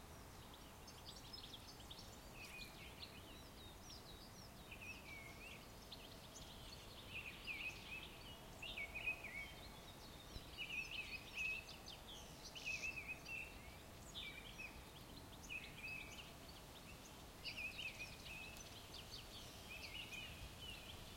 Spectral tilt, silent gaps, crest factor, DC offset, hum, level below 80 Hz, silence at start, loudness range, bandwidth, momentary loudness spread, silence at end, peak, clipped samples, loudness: -2.5 dB/octave; none; 20 dB; under 0.1%; none; -64 dBFS; 0 s; 7 LU; 16.5 kHz; 12 LU; 0 s; -34 dBFS; under 0.1%; -52 LUFS